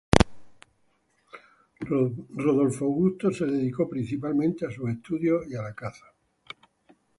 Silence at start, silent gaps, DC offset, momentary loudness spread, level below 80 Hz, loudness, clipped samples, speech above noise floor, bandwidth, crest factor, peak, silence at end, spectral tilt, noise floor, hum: 0.15 s; none; under 0.1%; 16 LU; -44 dBFS; -27 LUFS; under 0.1%; 43 dB; 11.5 kHz; 28 dB; 0 dBFS; 1.2 s; -6.5 dB/octave; -69 dBFS; none